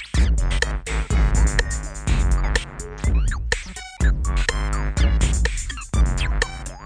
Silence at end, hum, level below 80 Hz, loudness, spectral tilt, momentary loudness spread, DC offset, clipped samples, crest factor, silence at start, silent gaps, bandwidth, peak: 0 s; none; -22 dBFS; -23 LUFS; -4.5 dB/octave; 6 LU; under 0.1%; under 0.1%; 16 dB; 0 s; none; 10.5 kHz; -4 dBFS